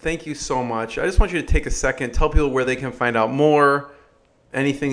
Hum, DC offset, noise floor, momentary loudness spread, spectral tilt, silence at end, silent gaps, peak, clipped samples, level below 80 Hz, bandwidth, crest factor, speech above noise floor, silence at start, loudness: none; under 0.1%; -56 dBFS; 9 LU; -5.5 dB/octave; 0 s; none; -2 dBFS; under 0.1%; -26 dBFS; 11 kHz; 18 dB; 37 dB; 0 s; -21 LUFS